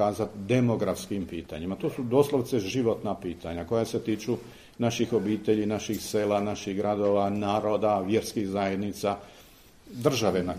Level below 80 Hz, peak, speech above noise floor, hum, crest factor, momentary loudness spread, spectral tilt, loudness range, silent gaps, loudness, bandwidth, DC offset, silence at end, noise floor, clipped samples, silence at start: -56 dBFS; -8 dBFS; 26 dB; none; 20 dB; 9 LU; -6 dB/octave; 2 LU; none; -28 LUFS; 15.5 kHz; under 0.1%; 0 s; -53 dBFS; under 0.1%; 0 s